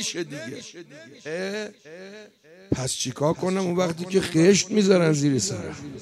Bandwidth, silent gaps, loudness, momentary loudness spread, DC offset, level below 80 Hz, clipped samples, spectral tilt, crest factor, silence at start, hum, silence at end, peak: 13.5 kHz; none; -23 LUFS; 23 LU; under 0.1%; -56 dBFS; under 0.1%; -4.5 dB/octave; 20 dB; 0 s; none; 0 s; -6 dBFS